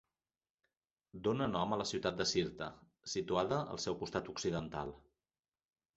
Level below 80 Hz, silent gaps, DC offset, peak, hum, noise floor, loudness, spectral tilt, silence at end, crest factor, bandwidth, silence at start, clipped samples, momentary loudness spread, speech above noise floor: -64 dBFS; none; under 0.1%; -18 dBFS; none; under -90 dBFS; -38 LUFS; -4 dB/octave; 0.95 s; 22 dB; 8 kHz; 1.15 s; under 0.1%; 12 LU; over 52 dB